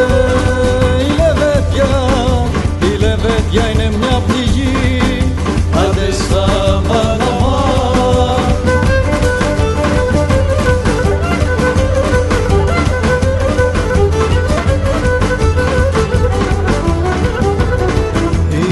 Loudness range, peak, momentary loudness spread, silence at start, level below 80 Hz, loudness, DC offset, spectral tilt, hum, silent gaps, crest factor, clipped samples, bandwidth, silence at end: 1 LU; 0 dBFS; 2 LU; 0 s; -18 dBFS; -13 LUFS; under 0.1%; -6 dB/octave; none; none; 12 dB; under 0.1%; 12 kHz; 0 s